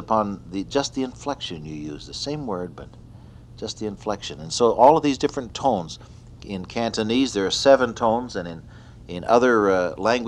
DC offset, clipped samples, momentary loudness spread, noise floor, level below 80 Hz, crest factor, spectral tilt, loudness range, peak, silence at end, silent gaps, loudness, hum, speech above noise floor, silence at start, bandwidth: under 0.1%; under 0.1%; 18 LU; -44 dBFS; -48 dBFS; 20 dB; -4.5 dB/octave; 10 LU; -2 dBFS; 0 s; none; -22 LUFS; none; 22 dB; 0 s; 11 kHz